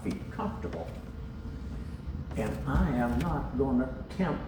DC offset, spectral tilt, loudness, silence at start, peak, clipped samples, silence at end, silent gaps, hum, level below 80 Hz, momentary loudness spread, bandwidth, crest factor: under 0.1%; -8 dB/octave; -33 LUFS; 0 s; -16 dBFS; under 0.1%; 0 s; none; none; -40 dBFS; 12 LU; over 20 kHz; 16 dB